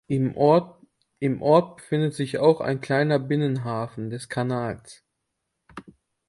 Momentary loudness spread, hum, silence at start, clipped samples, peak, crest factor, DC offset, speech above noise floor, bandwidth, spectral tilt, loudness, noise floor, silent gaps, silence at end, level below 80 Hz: 15 LU; none; 0.1 s; under 0.1%; -4 dBFS; 20 dB; under 0.1%; 56 dB; 11.5 kHz; -7.5 dB/octave; -24 LUFS; -79 dBFS; none; 0.45 s; -62 dBFS